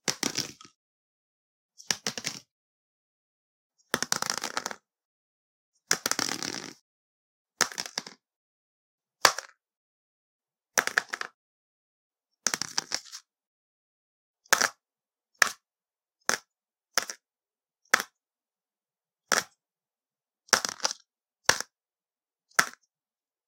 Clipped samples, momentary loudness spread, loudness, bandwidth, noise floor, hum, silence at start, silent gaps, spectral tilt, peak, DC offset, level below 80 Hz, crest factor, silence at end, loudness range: under 0.1%; 16 LU; -29 LUFS; 17 kHz; under -90 dBFS; none; 0.05 s; 0.76-1.69 s, 2.51-3.70 s, 5.05-5.72 s, 6.81-7.45 s, 8.36-8.98 s, 9.77-10.39 s, 11.34-12.10 s, 13.47-14.34 s; 0 dB/octave; 0 dBFS; under 0.1%; -74 dBFS; 34 dB; 0.75 s; 5 LU